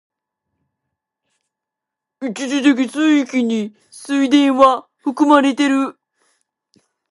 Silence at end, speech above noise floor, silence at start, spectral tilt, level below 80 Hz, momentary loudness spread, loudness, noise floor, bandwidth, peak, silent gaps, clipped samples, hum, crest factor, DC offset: 1.2 s; 69 dB; 2.2 s; -4 dB/octave; -66 dBFS; 13 LU; -16 LUFS; -83 dBFS; 11.5 kHz; 0 dBFS; none; under 0.1%; none; 18 dB; under 0.1%